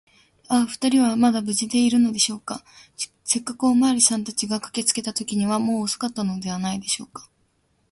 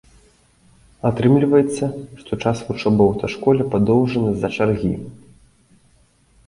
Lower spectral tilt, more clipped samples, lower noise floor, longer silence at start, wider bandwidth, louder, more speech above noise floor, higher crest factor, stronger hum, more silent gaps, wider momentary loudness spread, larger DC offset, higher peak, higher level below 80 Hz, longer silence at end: second, -3 dB/octave vs -7.5 dB/octave; neither; first, -66 dBFS vs -56 dBFS; second, 0.5 s vs 1.05 s; about the same, 12 kHz vs 11.5 kHz; second, -22 LUFS vs -19 LUFS; first, 44 dB vs 38 dB; about the same, 20 dB vs 18 dB; neither; neither; about the same, 10 LU vs 10 LU; neither; about the same, -4 dBFS vs -2 dBFS; second, -62 dBFS vs -46 dBFS; second, 0.7 s vs 1.3 s